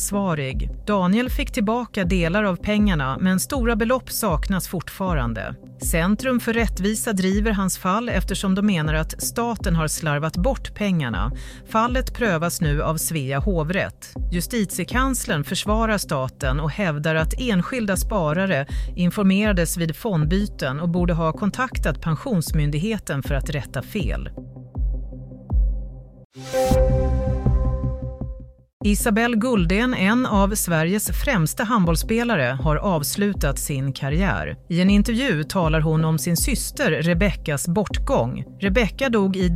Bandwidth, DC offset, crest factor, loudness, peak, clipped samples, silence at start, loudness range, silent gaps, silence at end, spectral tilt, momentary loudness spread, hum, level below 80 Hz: 16 kHz; under 0.1%; 16 dB; -22 LUFS; -6 dBFS; under 0.1%; 0 s; 4 LU; 26.25-26.30 s, 28.73-28.80 s; 0 s; -5.5 dB/octave; 8 LU; none; -28 dBFS